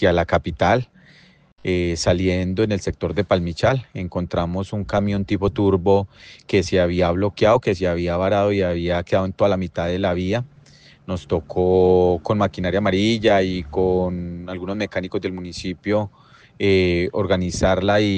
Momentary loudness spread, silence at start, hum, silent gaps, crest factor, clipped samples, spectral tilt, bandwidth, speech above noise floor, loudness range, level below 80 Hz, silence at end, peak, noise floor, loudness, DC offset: 10 LU; 0 s; none; 1.52-1.56 s; 16 dB; under 0.1%; -6.5 dB/octave; 9.4 kHz; 31 dB; 3 LU; -44 dBFS; 0 s; -4 dBFS; -51 dBFS; -20 LUFS; under 0.1%